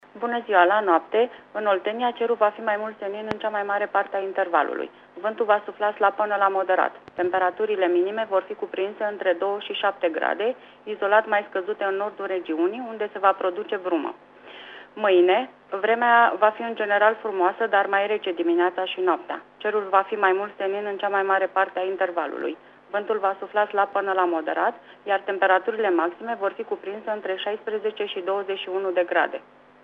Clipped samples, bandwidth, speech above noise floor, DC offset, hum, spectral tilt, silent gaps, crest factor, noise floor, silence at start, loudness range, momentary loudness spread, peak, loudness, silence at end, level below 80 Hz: under 0.1%; 5 kHz; 20 dB; under 0.1%; none; -6 dB/octave; none; 20 dB; -43 dBFS; 0.15 s; 4 LU; 10 LU; -4 dBFS; -24 LUFS; 0.45 s; -76 dBFS